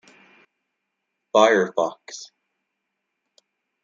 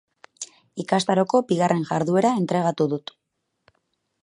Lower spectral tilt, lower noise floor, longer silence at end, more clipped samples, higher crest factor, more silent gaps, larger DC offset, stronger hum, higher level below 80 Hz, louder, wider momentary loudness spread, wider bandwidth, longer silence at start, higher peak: second, -3.5 dB/octave vs -6 dB/octave; about the same, -79 dBFS vs -78 dBFS; first, 1.6 s vs 1.25 s; neither; about the same, 24 dB vs 20 dB; neither; neither; neither; second, -78 dBFS vs -70 dBFS; about the same, -20 LUFS vs -22 LUFS; first, 21 LU vs 17 LU; second, 7.6 kHz vs 11.5 kHz; first, 1.35 s vs 0.4 s; about the same, -2 dBFS vs -4 dBFS